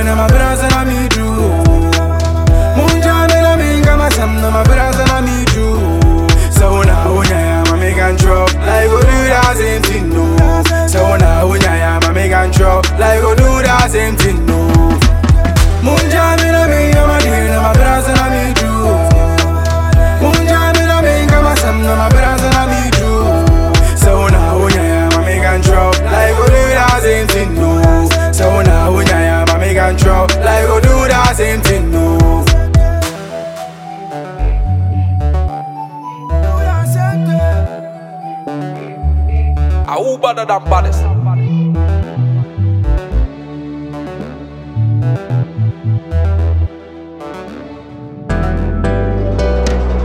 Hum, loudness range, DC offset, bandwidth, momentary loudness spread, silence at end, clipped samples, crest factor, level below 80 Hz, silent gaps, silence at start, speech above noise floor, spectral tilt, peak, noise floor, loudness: none; 7 LU; under 0.1%; 16.5 kHz; 12 LU; 0 s; under 0.1%; 10 dB; -14 dBFS; none; 0 s; 20 dB; -5.5 dB/octave; 0 dBFS; -30 dBFS; -11 LUFS